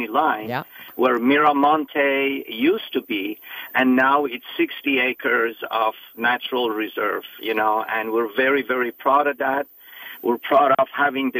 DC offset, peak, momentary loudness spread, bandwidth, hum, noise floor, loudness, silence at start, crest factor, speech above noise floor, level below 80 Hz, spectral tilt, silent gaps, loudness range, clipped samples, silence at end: under 0.1%; -4 dBFS; 10 LU; 16 kHz; none; -40 dBFS; -21 LUFS; 0 s; 16 dB; 19 dB; -72 dBFS; -6 dB/octave; none; 2 LU; under 0.1%; 0 s